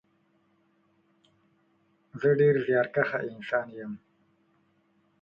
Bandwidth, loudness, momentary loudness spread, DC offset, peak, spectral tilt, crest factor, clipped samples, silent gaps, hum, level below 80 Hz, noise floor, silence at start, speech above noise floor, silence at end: 5.4 kHz; -27 LUFS; 19 LU; under 0.1%; -10 dBFS; -9 dB/octave; 20 dB; under 0.1%; none; none; -72 dBFS; -69 dBFS; 2.15 s; 43 dB; 1.25 s